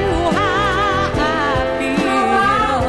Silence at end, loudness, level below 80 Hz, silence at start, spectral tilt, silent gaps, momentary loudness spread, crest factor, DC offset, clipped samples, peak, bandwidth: 0 s; -16 LUFS; -32 dBFS; 0 s; -5.5 dB/octave; none; 3 LU; 12 dB; under 0.1%; under 0.1%; -4 dBFS; 12 kHz